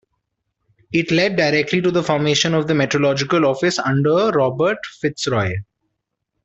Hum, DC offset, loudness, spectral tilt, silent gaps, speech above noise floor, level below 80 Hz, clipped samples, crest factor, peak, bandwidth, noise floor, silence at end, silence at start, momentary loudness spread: none; under 0.1%; -18 LUFS; -5 dB/octave; none; 59 dB; -56 dBFS; under 0.1%; 16 dB; -4 dBFS; 8.2 kHz; -76 dBFS; 0.8 s; 0.9 s; 6 LU